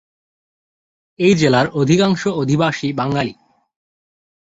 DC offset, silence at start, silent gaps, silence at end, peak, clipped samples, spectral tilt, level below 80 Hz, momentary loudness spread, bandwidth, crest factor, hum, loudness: under 0.1%; 1.2 s; none; 1.2 s; -2 dBFS; under 0.1%; -6 dB/octave; -52 dBFS; 7 LU; 8 kHz; 18 dB; none; -16 LUFS